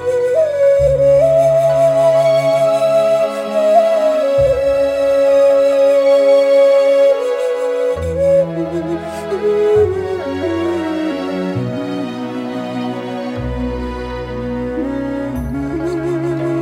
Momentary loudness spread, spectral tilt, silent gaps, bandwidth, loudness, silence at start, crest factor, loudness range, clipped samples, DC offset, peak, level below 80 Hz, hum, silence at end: 12 LU; -6.5 dB/octave; none; 12.5 kHz; -15 LUFS; 0 s; 12 dB; 10 LU; under 0.1%; under 0.1%; -2 dBFS; -36 dBFS; none; 0 s